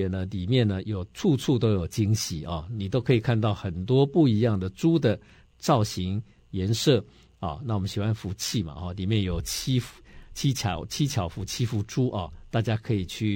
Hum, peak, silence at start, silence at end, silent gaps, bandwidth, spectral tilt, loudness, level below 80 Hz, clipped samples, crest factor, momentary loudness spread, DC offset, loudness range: none; -8 dBFS; 0 s; 0 s; none; 17 kHz; -6 dB/octave; -27 LUFS; -48 dBFS; under 0.1%; 18 dB; 10 LU; under 0.1%; 4 LU